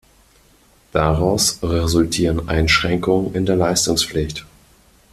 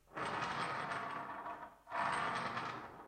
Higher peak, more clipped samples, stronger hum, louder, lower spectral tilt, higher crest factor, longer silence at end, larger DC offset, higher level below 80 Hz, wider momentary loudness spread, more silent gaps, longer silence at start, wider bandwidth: first, -2 dBFS vs -24 dBFS; neither; neither; first, -18 LUFS vs -41 LUFS; about the same, -4 dB/octave vs -4 dB/octave; about the same, 18 dB vs 16 dB; first, 0.65 s vs 0 s; neither; first, -34 dBFS vs -72 dBFS; second, 6 LU vs 9 LU; neither; first, 0.95 s vs 0.1 s; about the same, 15 kHz vs 16 kHz